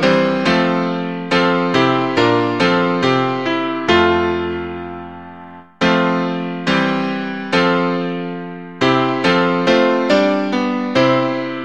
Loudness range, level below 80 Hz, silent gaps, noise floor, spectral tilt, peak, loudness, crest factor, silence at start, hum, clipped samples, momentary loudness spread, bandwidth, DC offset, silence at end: 3 LU; -50 dBFS; none; -37 dBFS; -6 dB/octave; 0 dBFS; -16 LUFS; 16 dB; 0 s; none; under 0.1%; 11 LU; 9.2 kHz; 0.5%; 0 s